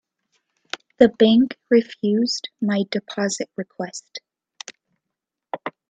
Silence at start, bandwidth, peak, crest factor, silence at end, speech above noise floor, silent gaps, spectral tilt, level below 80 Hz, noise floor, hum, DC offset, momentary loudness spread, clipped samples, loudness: 1 s; 9.2 kHz; 0 dBFS; 22 dB; 0.2 s; 64 dB; none; -5 dB/octave; -62 dBFS; -84 dBFS; none; under 0.1%; 23 LU; under 0.1%; -20 LUFS